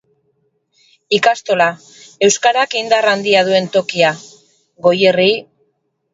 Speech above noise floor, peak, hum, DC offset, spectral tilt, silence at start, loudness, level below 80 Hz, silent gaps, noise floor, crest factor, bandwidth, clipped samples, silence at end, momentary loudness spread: 53 dB; 0 dBFS; none; under 0.1%; -3 dB/octave; 1.1 s; -14 LUFS; -64 dBFS; none; -66 dBFS; 16 dB; 8 kHz; under 0.1%; 0.7 s; 6 LU